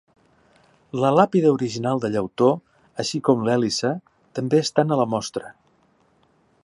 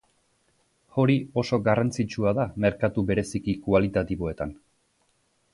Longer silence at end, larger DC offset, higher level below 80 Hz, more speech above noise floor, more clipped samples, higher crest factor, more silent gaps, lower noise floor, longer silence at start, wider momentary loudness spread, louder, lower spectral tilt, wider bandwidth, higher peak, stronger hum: first, 1.15 s vs 1 s; neither; second, -64 dBFS vs -48 dBFS; about the same, 41 dB vs 44 dB; neither; about the same, 20 dB vs 18 dB; neither; second, -61 dBFS vs -69 dBFS; about the same, 0.95 s vs 0.95 s; first, 14 LU vs 8 LU; first, -21 LUFS vs -26 LUFS; second, -5.5 dB/octave vs -7 dB/octave; about the same, 11.5 kHz vs 11.5 kHz; first, -2 dBFS vs -8 dBFS; neither